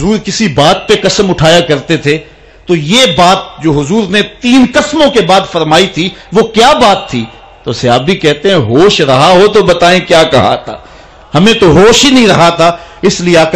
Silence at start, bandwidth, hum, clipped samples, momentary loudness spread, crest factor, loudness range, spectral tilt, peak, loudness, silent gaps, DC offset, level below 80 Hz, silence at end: 0 s; 15 kHz; none; 0.6%; 9 LU; 8 dB; 2 LU; -4.5 dB/octave; 0 dBFS; -7 LUFS; none; under 0.1%; -32 dBFS; 0 s